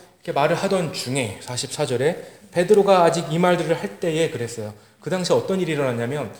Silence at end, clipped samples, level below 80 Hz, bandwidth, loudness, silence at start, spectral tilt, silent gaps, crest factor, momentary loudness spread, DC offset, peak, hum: 0 s; under 0.1%; -66 dBFS; over 20 kHz; -21 LUFS; 0.25 s; -5 dB/octave; none; 18 dB; 11 LU; 0.1%; -4 dBFS; none